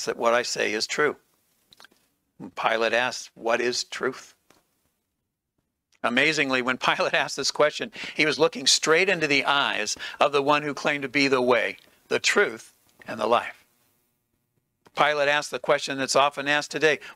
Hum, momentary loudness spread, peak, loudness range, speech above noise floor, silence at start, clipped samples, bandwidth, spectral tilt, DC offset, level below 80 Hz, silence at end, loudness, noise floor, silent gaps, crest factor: none; 10 LU; -4 dBFS; 6 LU; 57 dB; 0 s; under 0.1%; 16 kHz; -2 dB/octave; under 0.1%; -72 dBFS; 0.05 s; -23 LUFS; -81 dBFS; none; 22 dB